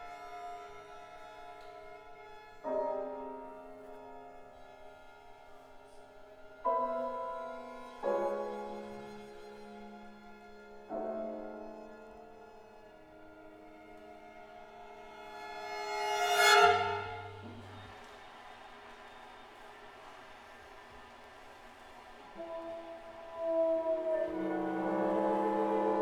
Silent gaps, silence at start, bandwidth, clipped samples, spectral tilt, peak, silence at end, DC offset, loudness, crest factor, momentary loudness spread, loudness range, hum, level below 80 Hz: none; 0 s; 20 kHz; under 0.1%; -3 dB/octave; -10 dBFS; 0 s; under 0.1%; -34 LUFS; 28 dB; 23 LU; 21 LU; none; -66 dBFS